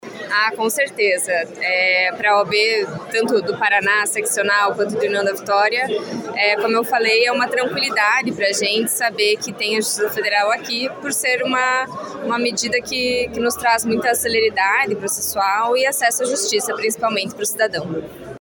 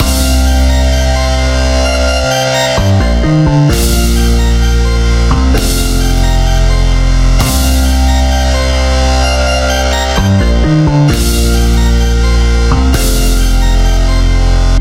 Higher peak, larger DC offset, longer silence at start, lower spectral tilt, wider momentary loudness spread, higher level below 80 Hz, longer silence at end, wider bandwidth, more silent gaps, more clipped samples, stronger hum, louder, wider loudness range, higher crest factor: second, -4 dBFS vs 0 dBFS; neither; about the same, 0.05 s vs 0 s; second, -2 dB/octave vs -5 dB/octave; first, 6 LU vs 2 LU; second, -58 dBFS vs -10 dBFS; about the same, 0 s vs 0 s; about the same, 17.5 kHz vs 16 kHz; neither; neither; neither; second, -18 LUFS vs -11 LUFS; about the same, 2 LU vs 1 LU; first, 16 dB vs 8 dB